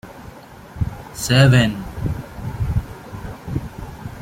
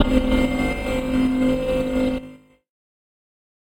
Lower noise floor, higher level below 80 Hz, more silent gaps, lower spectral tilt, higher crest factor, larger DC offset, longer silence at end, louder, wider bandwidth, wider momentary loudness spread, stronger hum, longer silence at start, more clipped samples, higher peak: about the same, -40 dBFS vs -43 dBFS; about the same, -34 dBFS vs -32 dBFS; neither; about the same, -5.5 dB/octave vs -6.5 dB/octave; about the same, 18 dB vs 18 dB; neither; second, 0 s vs 1.25 s; about the same, -20 LUFS vs -22 LUFS; about the same, 16 kHz vs 16.5 kHz; first, 25 LU vs 5 LU; neither; about the same, 0.05 s vs 0 s; neither; about the same, -2 dBFS vs -4 dBFS